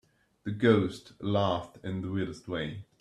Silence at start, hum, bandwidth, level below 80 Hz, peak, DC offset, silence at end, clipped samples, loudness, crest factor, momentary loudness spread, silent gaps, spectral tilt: 0.45 s; none; 11.5 kHz; -62 dBFS; -10 dBFS; under 0.1%; 0.2 s; under 0.1%; -31 LUFS; 20 dB; 14 LU; none; -7 dB/octave